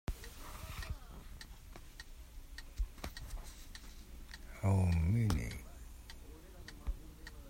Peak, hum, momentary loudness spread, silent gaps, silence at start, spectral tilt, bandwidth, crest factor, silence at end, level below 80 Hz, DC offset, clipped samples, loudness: -18 dBFS; none; 21 LU; none; 0.1 s; -6.5 dB/octave; 16 kHz; 22 dB; 0 s; -48 dBFS; under 0.1%; under 0.1%; -39 LUFS